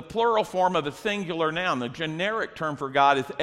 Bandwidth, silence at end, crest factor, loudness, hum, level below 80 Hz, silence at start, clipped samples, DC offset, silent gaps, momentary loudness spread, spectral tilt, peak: 14.5 kHz; 0 s; 18 dB; -25 LUFS; none; -60 dBFS; 0 s; under 0.1%; under 0.1%; none; 8 LU; -5 dB/octave; -8 dBFS